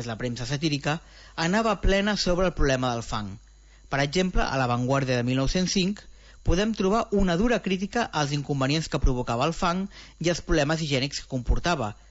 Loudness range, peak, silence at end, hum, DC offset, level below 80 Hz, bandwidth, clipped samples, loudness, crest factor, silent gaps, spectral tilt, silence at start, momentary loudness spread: 1 LU; -10 dBFS; 0.2 s; none; under 0.1%; -34 dBFS; 8 kHz; under 0.1%; -26 LUFS; 16 dB; none; -5 dB/octave; 0 s; 7 LU